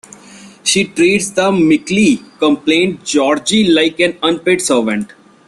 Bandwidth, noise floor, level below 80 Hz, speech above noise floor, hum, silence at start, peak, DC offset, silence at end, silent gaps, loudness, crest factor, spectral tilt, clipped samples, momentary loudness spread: 12.5 kHz; -38 dBFS; -52 dBFS; 25 dB; none; 0.35 s; 0 dBFS; under 0.1%; 0.4 s; none; -13 LUFS; 14 dB; -3.5 dB/octave; under 0.1%; 4 LU